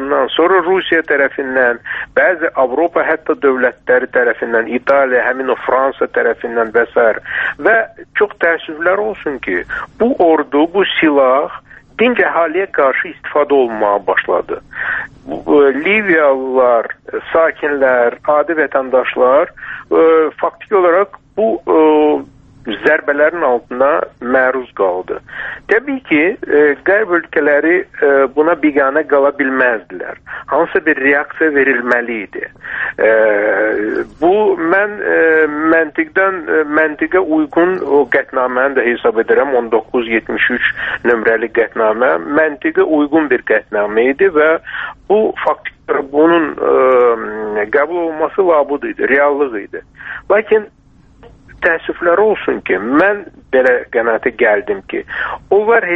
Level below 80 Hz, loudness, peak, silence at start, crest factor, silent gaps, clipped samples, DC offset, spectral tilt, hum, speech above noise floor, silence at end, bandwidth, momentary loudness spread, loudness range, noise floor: -50 dBFS; -13 LUFS; 0 dBFS; 0 s; 14 dB; none; under 0.1%; under 0.1%; -7 dB/octave; none; 29 dB; 0 s; 4.1 kHz; 8 LU; 2 LU; -43 dBFS